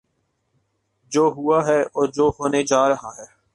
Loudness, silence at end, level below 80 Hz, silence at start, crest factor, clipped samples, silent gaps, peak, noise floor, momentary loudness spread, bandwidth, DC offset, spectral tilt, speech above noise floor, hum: -20 LUFS; 0.3 s; -52 dBFS; 1.1 s; 16 dB; under 0.1%; none; -4 dBFS; -71 dBFS; 6 LU; 11.5 kHz; under 0.1%; -4.5 dB/octave; 52 dB; none